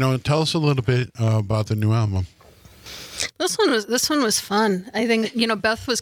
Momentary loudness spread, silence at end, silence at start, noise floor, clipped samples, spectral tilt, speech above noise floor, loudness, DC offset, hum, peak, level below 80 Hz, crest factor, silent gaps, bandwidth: 8 LU; 0 s; 0 s; -47 dBFS; under 0.1%; -4.5 dB/octave; 27 dB; -21 LUFS; under 0.1%; none; -4 dBFS; -52 dBFS; 18 dB; none; 18 kHz